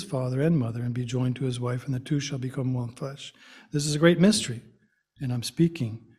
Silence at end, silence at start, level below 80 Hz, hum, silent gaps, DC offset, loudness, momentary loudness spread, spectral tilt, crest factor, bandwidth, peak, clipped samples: 0.2 s; 0 s; -58 dBFS; none; none; under 0.1%; -27 LUFS; 15 LU; -5.5 dB/octave; 22 dB; 14 kHz; -6 dBFS; under 0.1%